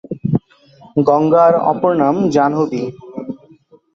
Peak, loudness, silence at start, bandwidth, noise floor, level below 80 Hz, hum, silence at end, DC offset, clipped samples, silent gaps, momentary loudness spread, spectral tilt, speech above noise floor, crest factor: -2 dBFS; -15 LUFS; 0.1 s; 7.6 kHz; -48 dBFS; -52 dBFS; none; 0.6 s; under 0.1%; under 0.1%; none; 18 LU; -8.5 dB/octave; 35 dB; 14 dB